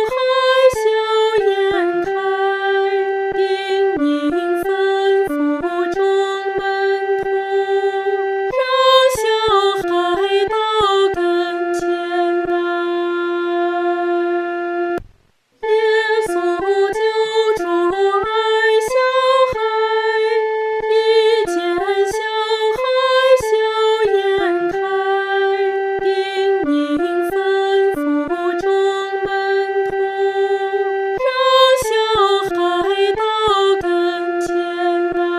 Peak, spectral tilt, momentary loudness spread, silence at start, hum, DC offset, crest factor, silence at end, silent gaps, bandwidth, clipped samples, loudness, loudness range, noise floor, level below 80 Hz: -2 dBFS; -3.5 dB/octave; 5 LU; 0 s; none; under 0.1%; 16 dB; 0 s; none; 14 kHz; under 0.1%; -17 LUFS; 3 LU; -56 dBFS; -50 dBFS